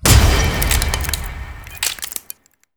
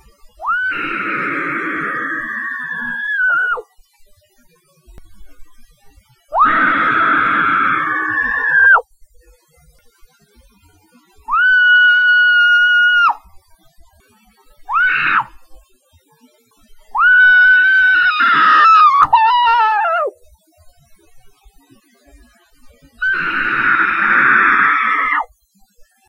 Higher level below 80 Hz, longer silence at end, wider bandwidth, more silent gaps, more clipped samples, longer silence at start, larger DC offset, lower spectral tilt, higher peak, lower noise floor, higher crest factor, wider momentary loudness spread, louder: first, -20 dBFS vs -50 dBFS; second, 0.55 s vs 0.85 s; first, over 20 kHz vs 10 kHz; neither; neither; second, 0 s vs 0.4 s; neither; about the same, -3.5 dB/octave vs -3.5 dB/octave; about the same, 0 dBFS vs 0 dBFS; second, -40 dBFS vs -54 dBFS; about the same, 18 dB vs 16 dB; first, 20 LU vs 12 LU; second, -18 LUFS vs -12 LUFS